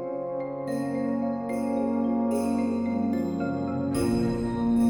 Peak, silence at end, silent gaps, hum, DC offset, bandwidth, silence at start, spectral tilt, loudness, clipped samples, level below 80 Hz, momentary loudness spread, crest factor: -14 dBFS; 0 s; none; none; under 0.1%; 18.5 kHz; 0 s; -7.5 dB/octave; -28 LUFS; under 0.1%; -48 dBFS; 5 LU; 12 dB